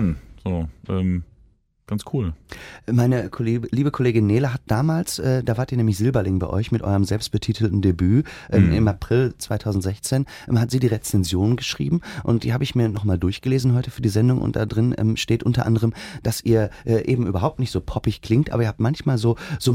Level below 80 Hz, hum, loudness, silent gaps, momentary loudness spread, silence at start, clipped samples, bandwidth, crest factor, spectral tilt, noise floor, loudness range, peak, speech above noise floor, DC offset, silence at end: -40 dBFS; none; -22 LUFS; none; 7 LU; 0 s; under 0.1%; 16 kHz; 18 dB; -6.5 dB/octave; -56 dBFS; 2 LU; -2 dBFS; 36 dB; under 0.1%; 0 s